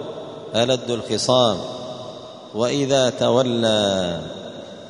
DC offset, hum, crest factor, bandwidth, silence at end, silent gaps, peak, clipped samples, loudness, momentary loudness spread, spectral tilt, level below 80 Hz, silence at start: under 0.1%; none; 18 dB; 10.5 kHz; 0 s; none; -2 dBFS; under 0.1%; -20 LUFS; 16 LU; -4.5 dB/octave; -56 dBFS; 0 s